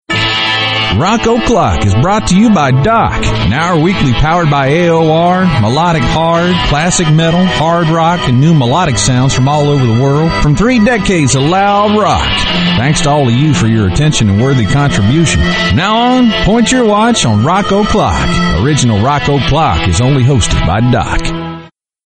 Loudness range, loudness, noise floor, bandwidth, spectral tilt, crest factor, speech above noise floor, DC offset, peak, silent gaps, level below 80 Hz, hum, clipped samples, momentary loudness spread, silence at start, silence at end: 1 LU; -10 LUFS; -33 dBFS; 9.2 kHz; -5 dB/octave; 10 dB; 24 dB; under 0.1%; 0 dBFS; none; -24 dBFS; none; under 0.1%; 2 LU; 0.1 s; 0.4 s